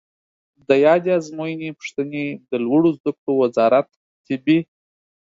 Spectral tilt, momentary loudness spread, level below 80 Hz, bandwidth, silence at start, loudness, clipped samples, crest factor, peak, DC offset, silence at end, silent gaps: -7 dB/octave; 13 LU; -68 dBFS; 7.6 kHz; 0.7 s; -20 LUFS; under 0.1%; 18 dB; -2 dBFS; under 0.1%; 0.75 s; 3.00-3.04 s, 3.18-3.27 s, 3.96-4.24 s